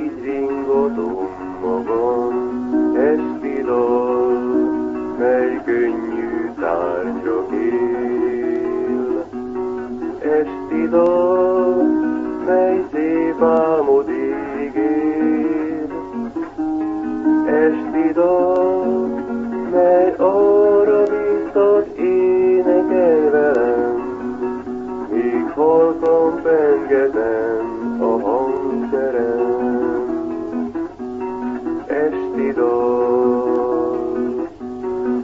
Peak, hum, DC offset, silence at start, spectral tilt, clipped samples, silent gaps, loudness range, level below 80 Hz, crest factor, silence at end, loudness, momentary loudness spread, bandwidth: -2 dBFS; none; 0.1%; 0 s; -8.5 dB/octave; under 0.1%; none; 5 LU; -52 dBFS; 14 dB; 0 s; -18 LUFS; 10 LU; 7.2 kHz